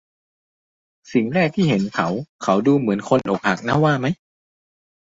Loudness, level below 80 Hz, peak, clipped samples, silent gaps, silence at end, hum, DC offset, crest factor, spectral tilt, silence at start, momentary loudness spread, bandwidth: -20 LUFS; -56 dBFS; -2 dBFS; under 0.1%; 2.29-2.39 s; 1 s; none; under 0.1%; 18 dB; -7 dB/octave; 1.1 s; 7 LU; 7.8 kHz